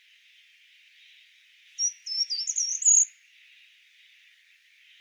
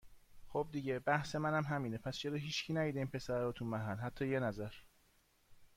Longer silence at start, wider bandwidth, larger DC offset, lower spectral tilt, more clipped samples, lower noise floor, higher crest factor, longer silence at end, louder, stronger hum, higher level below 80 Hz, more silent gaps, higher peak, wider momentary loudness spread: first, 1.8 s vs 0.05 s; first, 19.5 kHz vs 16 kHz; neither; second, 13 dB/octave vs -6 dB/octave; neither; second, -60 dBFS vs -72 dBFS; about the same, 20 dB vs 20 dB; first, 1.95 s vs 0.1 s; first, -23 LUFS vs -39 LUFS; neither; second, under -90 dBFS vs -64 dBFS; neither; first, -10 dBFS vs -20 dBFS; first, 10 LU vs 6 LU